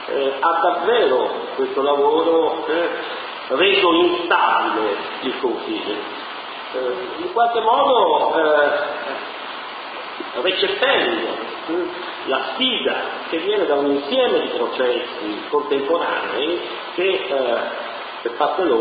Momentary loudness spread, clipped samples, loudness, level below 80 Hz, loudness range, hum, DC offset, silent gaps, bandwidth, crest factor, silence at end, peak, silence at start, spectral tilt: 12 LU; under 0.1%; -20 LUFS; -64 dBFS; 4 LU; none; under 0.1%; none; 5 kHz; 18 dB; 0 s; -2 dBFS; 0 s; -7 dB/octave